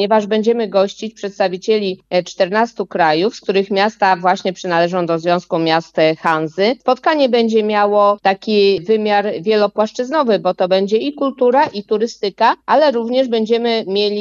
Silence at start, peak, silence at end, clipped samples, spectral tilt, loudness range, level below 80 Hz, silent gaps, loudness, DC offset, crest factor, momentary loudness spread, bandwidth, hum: 0 s; -2 dBFS; 0 s; under 0.1%; -5.5 dB/octave; 2 LU; -64 dBFS; none; -16 LUFS; under 0.1%; 14 dB; 5 LU; 7.6 kHz; none